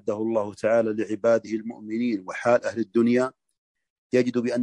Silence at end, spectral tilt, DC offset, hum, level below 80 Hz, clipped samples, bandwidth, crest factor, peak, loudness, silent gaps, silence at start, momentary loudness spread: 0 s; -6.5 dB/octave; under 0.1%; none; -72 dBFS; under 0.1%; 10.5 kHz; 16 dB; -8 dBFS; -25 LUFS; 3.58-3.75 s, 3.90-4.10 s; 0.05 s; 7 LU